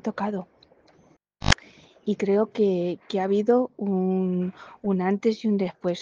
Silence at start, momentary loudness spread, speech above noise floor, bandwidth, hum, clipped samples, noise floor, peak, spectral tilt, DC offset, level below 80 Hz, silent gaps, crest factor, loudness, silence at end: 0.05 s; 9 LU; 35 dB; 9.6 kHz; none; under 0.1%; -60 dBFS; 0 dBFS; -6 dB/octave; under 0.1%; -44 dBFS; none; 24 dB; -25 LUFS; 0 s